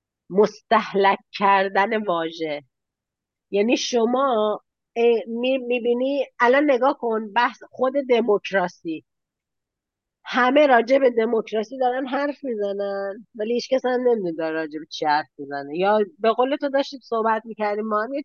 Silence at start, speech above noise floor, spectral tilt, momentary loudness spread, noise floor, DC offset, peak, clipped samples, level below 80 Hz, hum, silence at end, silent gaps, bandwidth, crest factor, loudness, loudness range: 0.3 s; 64 dB; -4.5 dB/octave; 10 LU; -85 dBFS; under 0.1%; -6 dBFS; under 0.1%; -76 dBFS; none; 0 s; none; 7 kHz; 16 dB; -22 LUFS; 3 LU